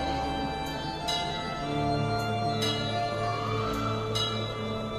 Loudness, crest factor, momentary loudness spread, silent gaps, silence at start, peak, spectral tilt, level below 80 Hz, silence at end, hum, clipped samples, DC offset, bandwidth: -30 LUFS; 14 dB; 4 LU; none; 0 s; -16 dBFS; -5 dB/octave; -46 dBFS; 0 s; none; under 0.1%; under 0.1%; 15 kHz